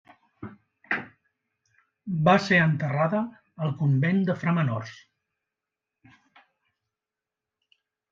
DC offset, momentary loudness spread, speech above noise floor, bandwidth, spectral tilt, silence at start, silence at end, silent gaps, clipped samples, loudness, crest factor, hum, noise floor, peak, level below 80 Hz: under 0.1%; 23 LU; 65 dB; 7.4 kHz; -7.5 dB/octave; 0.4 s; 3.15 s; none; under 0.1%; -25 LUFS; 22 dB; none; -89 dBFS; -6 dBFS; -68 dBFS